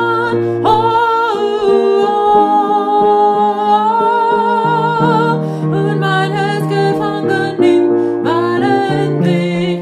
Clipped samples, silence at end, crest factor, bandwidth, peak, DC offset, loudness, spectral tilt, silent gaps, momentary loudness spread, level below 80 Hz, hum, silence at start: under 0.1%; 0 s; 12 dB; 12.5 kHz; 0 dBFS; under 0.1%; -13 LUFS; -7.5 dB/octave; none; 5 LU; -50 dBFS; none; 0 s